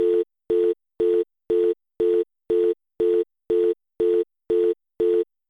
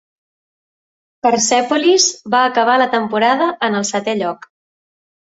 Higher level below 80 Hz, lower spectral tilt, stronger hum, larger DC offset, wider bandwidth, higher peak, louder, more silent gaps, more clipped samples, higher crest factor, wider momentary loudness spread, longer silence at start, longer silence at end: about the same, -60 dBFS vs -64 dBFS; first, -8 dB/octave vs -2 dB/octave; neither; neither; second, 3.9 kHz vs 8 kHz; second, -12 dBFS vs -2 dBFS; second, -23 LUFS vs -15 LUFS; neither; neither; second, 10 dB vs 16 dB; second, 3 LU vs 7 LU; second, 0 s vs 1.25 s; second, 0.25 s vs 1.05 s